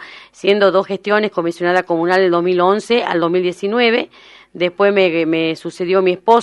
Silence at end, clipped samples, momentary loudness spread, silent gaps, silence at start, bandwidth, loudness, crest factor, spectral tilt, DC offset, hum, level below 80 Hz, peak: 0 s; under 0.1%; 7 LU; none; 0 s; 11.5 kHz; -15 LUFS; 16 dB; -5.5 dB/octave; under 0.1%; none; -64 dBFS; 0 dBFS